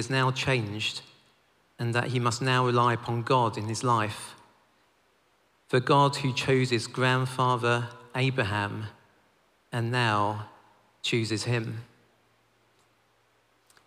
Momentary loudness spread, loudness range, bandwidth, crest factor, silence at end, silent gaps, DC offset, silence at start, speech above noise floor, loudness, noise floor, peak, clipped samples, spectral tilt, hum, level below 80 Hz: 12 LU; 5 LU; 14 kHz; 18 dB; 2 s; none; under 0.1%; 0 s; 41 dB; -27 LUFS; -67 dBFS; -10 dBFS; under 0.1%; -5 dB/octave; none; -66 dBFS